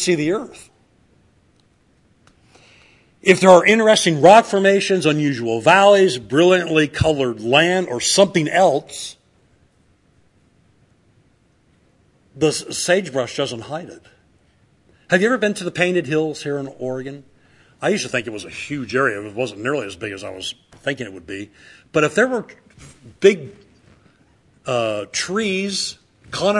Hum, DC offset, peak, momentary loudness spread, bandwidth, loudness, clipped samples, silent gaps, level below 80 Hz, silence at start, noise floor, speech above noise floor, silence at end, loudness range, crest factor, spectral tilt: none; under 0.1%; 0 dBFS; 18 LU; 12 kHz; -17 LUFS; under 0.1%; none; -54 dBFS; 0 s; -58 dBFS; 41 dB; 0 s; 11 LU; 20 dB; -4 dB/octave